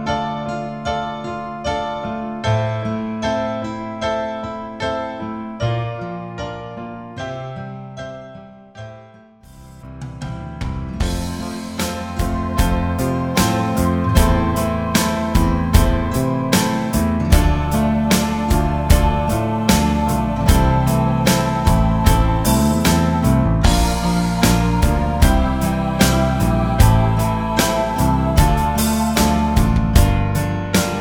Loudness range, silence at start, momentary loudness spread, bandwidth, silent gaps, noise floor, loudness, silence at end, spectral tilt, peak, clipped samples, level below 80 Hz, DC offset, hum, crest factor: 12 LU; 0 s; 13 LU; over 20 kHz; none; -44 dBFS; -18 LUFS; 0 s; -5.5 dB/octave; 0 dBFS; under 0.1%; -22 dBFS; under 0.1%; none; 18 dB